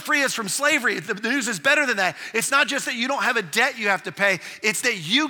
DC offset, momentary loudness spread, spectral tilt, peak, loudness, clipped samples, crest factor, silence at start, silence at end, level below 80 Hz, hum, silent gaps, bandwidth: under 0.1%; 5 LU; -2 dB/octave; -4 dBFS; -21 LUFS; under 0.1%; 18 dB; 0 s; 0 s; -78 dBFS; none; none; 19.5 kHz